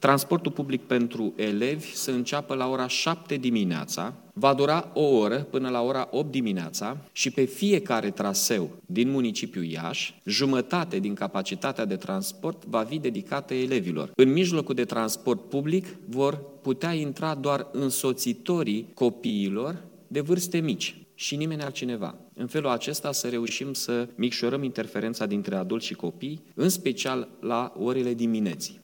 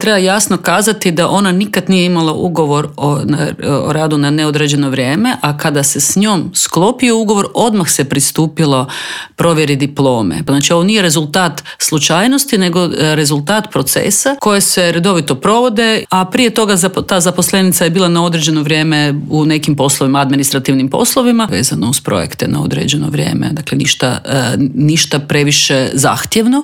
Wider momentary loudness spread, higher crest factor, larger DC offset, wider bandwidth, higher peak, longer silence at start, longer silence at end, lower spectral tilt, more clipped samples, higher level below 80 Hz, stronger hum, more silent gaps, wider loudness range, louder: first, 8 LU vs 4 LU; first, 22 dB vs 12 dB; neither; about the same, 18.5 kHz vs 17.5 kHz; second, -4 dBFS vs 0 dBFS; about the same, 0 s vs 0 s; about the same, 0.05 s vs 0 s; about the same, -4.5 dB/octave vs -4 dB/octave; neither; second, -80 dBFS vs -48 dBFS; neither; neither; about the same, 4 LU vs 2 LU; second, -27 LUFS vs -11 LUFS